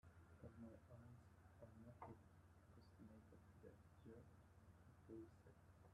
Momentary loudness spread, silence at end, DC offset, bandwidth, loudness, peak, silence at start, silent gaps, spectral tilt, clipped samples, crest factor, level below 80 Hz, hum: 7 LU; 0 s; under 0.1%; 11.5 kHz; -65 LUFS; -46 dBFS; 0.05 s; none; -7.5 dB/octave; under 0.1%; 20 dB; -78 dBFS; none